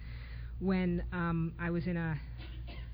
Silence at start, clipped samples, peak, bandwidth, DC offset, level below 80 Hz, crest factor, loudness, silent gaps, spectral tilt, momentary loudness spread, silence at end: 0 s; under 0.1%; -22 dBFS; 5.2 kHz; under 0.1%; -44 dBFS; 14 dB; -36 LUFS; none; -11 dB/octave; 13 LU; 0 s